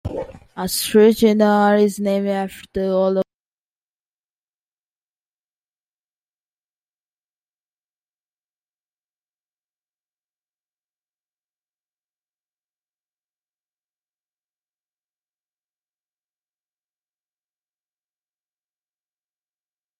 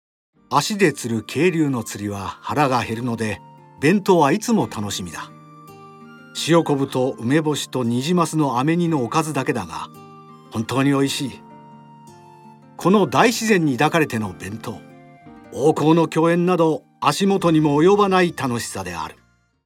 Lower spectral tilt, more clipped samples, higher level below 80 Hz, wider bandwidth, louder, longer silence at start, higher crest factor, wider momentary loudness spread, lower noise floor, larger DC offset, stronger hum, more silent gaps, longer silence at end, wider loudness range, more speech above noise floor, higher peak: about the same, -5.5 dB/octave vs -5.5 dB/octave; neither; about the same, -56 dBFS vs -60 dBFS; about the same, 16 kHz vs 17 kHz; about the same, -17 LUFS vs -19 LUFS; second, 0.05 s vs 0.5 s; about the same, 24 dB vs 20 dB; about the same, 16 LU vs 15 LU; first, under -90 dBFS vs -45 dBFS; neither; first, 50 Hz at -55 dBFS vs none; neither; first, 16.75 s vs 0.55 s; first, 10 LU vs 5 LU; first, over 74 dB vs 26 dB; about the same, -2 dBFS vs 0 dBFS